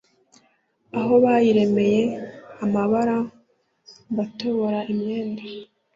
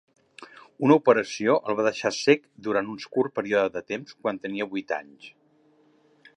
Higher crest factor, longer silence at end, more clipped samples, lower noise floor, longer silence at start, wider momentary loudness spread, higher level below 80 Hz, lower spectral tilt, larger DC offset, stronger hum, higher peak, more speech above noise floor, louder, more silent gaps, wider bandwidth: second, 16 dB vs 22 dB; second, 0.3 s vs 1.05 s; neither; about the same, -64 dBFS vs -62 dBFS; first, 0.95 s vs 0.4 s; first, 16 LU vs 11 LU; first, -64 dBFS vs -72 dBFS; first, -7.5 dB/octave vs -5 dB/octave; neither; neither; about the same, -6 dBFS vs -4 dBFS; first, 44 dB vs 37 dB; first, -22 LUFS vs -25 LUFS; neither; second, 7.6 kHz vs 11 kHz